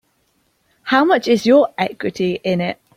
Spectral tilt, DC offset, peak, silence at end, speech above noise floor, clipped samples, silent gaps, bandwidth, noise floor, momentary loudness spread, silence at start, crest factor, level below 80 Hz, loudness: -6 dB/octave; under 0.1%; -2 dBFS; 0.25 s; 48 dB; under 0.1%; none; 16 kHz; -63 dBFS; 9 LU; 0.85 s; 16 dB; -60 dBFS; -16 LUFS